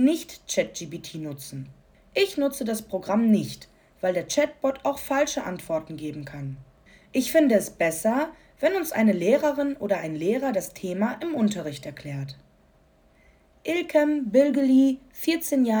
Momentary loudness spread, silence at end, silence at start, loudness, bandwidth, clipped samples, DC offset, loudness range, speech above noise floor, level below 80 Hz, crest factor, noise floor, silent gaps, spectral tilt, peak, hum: 15 LU; 0 s; 0 s; -25 LUFS; over 20 kHz; under 0.1%; under 0.1%; 5 LU; 35 dB; -60 dBFS; 18 dB; -59 dBFS; none; -5 dB/octave; -8 dBFS; none